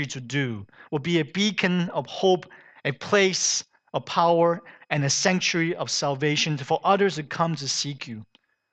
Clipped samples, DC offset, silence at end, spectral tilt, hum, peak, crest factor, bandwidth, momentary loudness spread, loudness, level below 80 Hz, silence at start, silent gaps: under 0.1%; under 0.1%; 0.5 s; -3.5 dB/octave; none; -6 dBFS; 20 dB; 9 kHz; 11 LU; -24 LUFS; -70 dBFS; 0 s; none